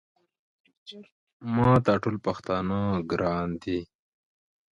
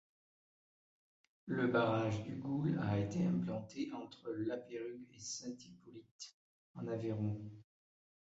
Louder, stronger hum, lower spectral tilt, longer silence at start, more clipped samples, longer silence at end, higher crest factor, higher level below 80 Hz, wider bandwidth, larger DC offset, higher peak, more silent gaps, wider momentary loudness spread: first, -27 LUFS vs -40 LUFS; neither; first, -8.5 dB/octave vs -6.5 dB/octave; second, 0.85 s vs 1.45 s; neither; about the same, 0.85 s vs 0.75 s; about the same, 20 dB vs 20 dB; first, -52 dBFS vs -68 dBFS; about the same, 7.8 kHz vs 8 kHz; neither; first, -8 dBFS vs -22 dBFS; second, 1.12-1.27 s, 1.33-1.40 s vs 6.11-6.19 s, 6.34-6.74 s; about the same, 20 LU vs 18 LU